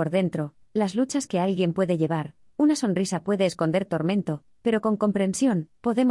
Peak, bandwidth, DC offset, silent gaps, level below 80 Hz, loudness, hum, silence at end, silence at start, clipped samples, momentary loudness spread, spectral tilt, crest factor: -10 dBFS; 12 kHz; under 0.1%; none; -64 dBFS; -25 LUFS; none; 0 s; 0 s; under 0.1%; 5 LU; -6 dB/octave; 14 dB